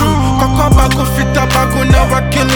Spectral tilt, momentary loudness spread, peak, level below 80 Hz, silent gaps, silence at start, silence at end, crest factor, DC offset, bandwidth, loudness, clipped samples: -5.5 dB/octave; 3 LU; 0 dBFS; -16 dBFS; none; 0 s; 0 s; 10 dB; under 0.1%; over 20 kHz; -11 LUFS; under 0.1%